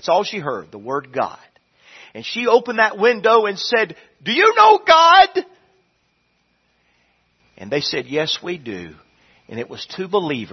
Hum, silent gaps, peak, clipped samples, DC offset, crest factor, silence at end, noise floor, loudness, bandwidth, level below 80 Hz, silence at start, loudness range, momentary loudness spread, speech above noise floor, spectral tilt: none; none; 0 dBFS; under 0.1%; under 0.1%; 18 dB; 0.05 s; -65 dBFS; -16 LUFS; 6.4 kHz; -60 dBFS; 0.05 s; 12 LU; 19 LU; 48 dB; -3.5 dB/octave